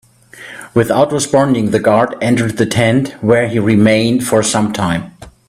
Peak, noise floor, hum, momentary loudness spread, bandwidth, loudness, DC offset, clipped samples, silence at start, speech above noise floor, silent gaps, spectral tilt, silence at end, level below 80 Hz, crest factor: 0 dBFS; -36 dBFS; none; 7 LU; 15 kHz; -13 LUFS; under 0.1%; under 0.1%; 0.35 s; 24 dB; none; -5.5 dB/octave; 0.2 s; -46 dBFS; 14 dB